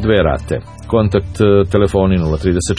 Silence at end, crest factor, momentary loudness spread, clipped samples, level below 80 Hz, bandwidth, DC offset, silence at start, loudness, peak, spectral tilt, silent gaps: 0 s; 14 dB; 7 LU; under 0.1%; -28 dBFS; 10.5 kHz; 0.3%; 0 s; -15 LUFS; 0 dBFS; -6.5 dB/octave; none